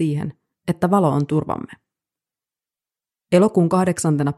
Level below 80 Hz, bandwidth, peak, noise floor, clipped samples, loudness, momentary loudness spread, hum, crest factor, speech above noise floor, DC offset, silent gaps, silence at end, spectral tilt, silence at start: -56 dBFS; 12.5 kHz; -2 dBFS; under -90 dBFS; under 0.1%; -19 LUFS; 14 LU; none; 18 dB; over 72 dB; under 0.1%; none; 0.05 s; -7 dB/octave; 0 s